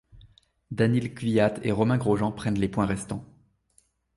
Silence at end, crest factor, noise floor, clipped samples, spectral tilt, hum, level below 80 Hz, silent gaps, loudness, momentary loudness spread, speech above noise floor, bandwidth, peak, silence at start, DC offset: 0.9 s; 18 dB; -66 dBFS; under 0.1%; -7 dB/octave; none; -52 dBFS; none; -26 LUFS; 10 LU; 41 dB; 11.5 kHz; -8 dBFS; 0.15 s; under 0.1%